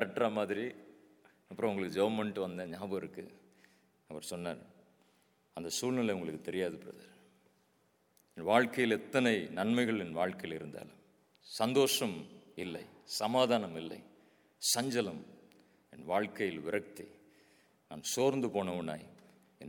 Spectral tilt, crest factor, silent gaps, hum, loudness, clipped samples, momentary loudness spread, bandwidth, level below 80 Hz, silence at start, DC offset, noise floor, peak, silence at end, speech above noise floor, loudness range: -4 dB/octave; 26 dB; none; none; -35 LUFS; under 0.1%; 20 LU; 19 kHz; -78 dBFS; 0 s; under 0.1%; -73 dBFS; -12 dBFS; 0 s; 38 dB; 7 LU